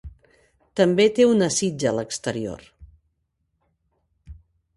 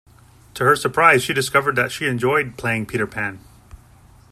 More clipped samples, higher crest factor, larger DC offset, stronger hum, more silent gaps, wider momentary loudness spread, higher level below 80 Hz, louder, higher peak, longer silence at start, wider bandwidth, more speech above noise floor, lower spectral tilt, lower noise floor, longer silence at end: neither; about the same, 18 dB vs 20 dB; neither; neither; neither; first, 16 LU vs 10 LU; about the same, -52 dBFS vs -52 dBFS; second, -21 LUFS vs -18 LUFS; second, -6 dBFS vs 0 dBFS; second, 0.05 s vs 0.55 s; second, 11.5 kHz vs 15.5 kHz; first, 53 dB vs 30 dB; about the same, -4.5 dB/octave vs -4.5 dB/octave; first, -73 dBFS vs -49 dBFS; second, 0.45 s vs 0.95 s